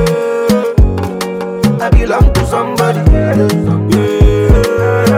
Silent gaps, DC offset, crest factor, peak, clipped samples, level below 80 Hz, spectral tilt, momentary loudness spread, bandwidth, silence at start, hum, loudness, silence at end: none; under 0.1%; 10 dB; 0 dBFS; 0.5%; -16 dBFS; -7 dB/octave; 5 LU; 16 kHz; 0 s; none; -12 LUFS; 0 s